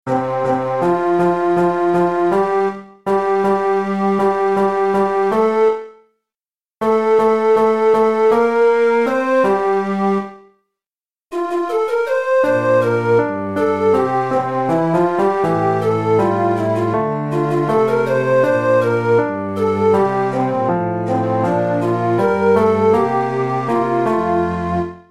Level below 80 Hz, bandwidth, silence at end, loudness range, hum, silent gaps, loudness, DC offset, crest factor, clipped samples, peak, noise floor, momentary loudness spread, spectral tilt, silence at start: -52 dBFS; 12 kHz; 0.1 s; 3 LU; none; none; -16 LUFS; 0.5%; 16 dB; under 0.1%; 0 dBFS; under -90 dBFS; 5 LU; -8 dB/octave; 0.05 s